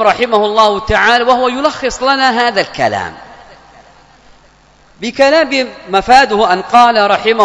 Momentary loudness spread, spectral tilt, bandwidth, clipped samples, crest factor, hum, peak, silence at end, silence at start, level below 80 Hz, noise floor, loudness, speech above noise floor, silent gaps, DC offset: 8 LU; -3.5 dB/octave; 11 kHz; 0.8%; 12 dB; none; 0 dBFS; 0 s; 0 s; -38 dBFS; -46 dBFS; -11 LUFS; 35 dB; none; under 0.1%